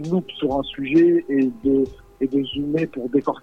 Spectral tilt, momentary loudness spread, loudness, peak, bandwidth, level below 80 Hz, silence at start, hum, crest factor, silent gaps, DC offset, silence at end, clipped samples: -8 dB/octave; 8 LU; -21 LUFS; -6 dBFS; 6.6 kHz; -48 dBFS; 0 s; none; 14 dB; none; under 0.1%; 0.05 s; under 0.1%